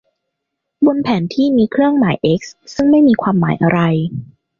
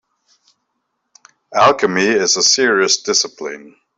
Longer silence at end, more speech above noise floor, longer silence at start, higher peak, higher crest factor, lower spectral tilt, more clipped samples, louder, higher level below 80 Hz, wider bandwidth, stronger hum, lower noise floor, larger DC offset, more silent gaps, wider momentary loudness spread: about the same, 0.35 s vs 0.3 s; first, 63 dB vs 57 dB; second, 0.8 s vs 1.5 s; about the same, -2 dBFS vs -2 dBFS; about the same, 12 dB vs 16 dB; first, -7.5 dB/octave vs -1.5 dB/octave; neither; about the same, -14 LUFS vs -13 LUFS; first, -50 dBFS vs -62 dBFS; second, 7.2 kHz vs 8.4 kHz; neither; first, -76 dBFS vs -72 dBFS; neither; neither; second, 9 LU vs 15 LU